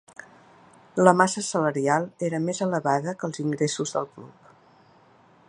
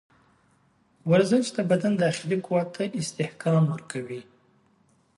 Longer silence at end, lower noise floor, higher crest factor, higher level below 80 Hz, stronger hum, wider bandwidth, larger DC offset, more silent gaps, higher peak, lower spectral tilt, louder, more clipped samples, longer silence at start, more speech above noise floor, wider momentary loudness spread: first, 1.2 s vs 0.95 s; second, -56 dBFS vs -64 dBFS; first, 26 dB vs 18 dB; about the same, -72 dBFS vs -68 dBFS; neither; about the same, 11 kHz vs 11.5 kHz; neither; neither; first, 0 dBFS vs -8 dBFS; second, -5 dB/octave vs -6.5 dB/octave; about the same, -24 LUFS vs -25 LUFS; neither; about the same, 0.95 s vs 1.05 s; second, 32 dB vs 40 dB; about the same, 13 LU vs 13 LU